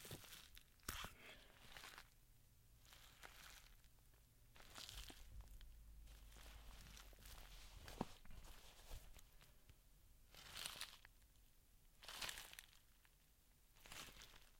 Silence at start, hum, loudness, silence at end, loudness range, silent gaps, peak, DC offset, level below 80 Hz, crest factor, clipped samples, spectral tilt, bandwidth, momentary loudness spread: 0 s; none; -58 LUFS; 0 s; 6 LU; none; -28 dBFS; under 0.1%; -66 dBFS; 32 dB; under 0.1%; -2 dB/octave; 16.5 kHz; 15 LU